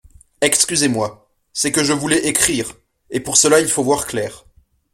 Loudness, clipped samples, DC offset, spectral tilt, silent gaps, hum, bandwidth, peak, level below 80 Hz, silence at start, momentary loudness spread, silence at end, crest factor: -16 LUFS; under 0.1%; under 0.1%; -2.5 dB/octave; none; none; 16.5 kHz; 0 dBFS; -50 dBFS; 0.4 s; 13 LU; 0.55 s; 18 dB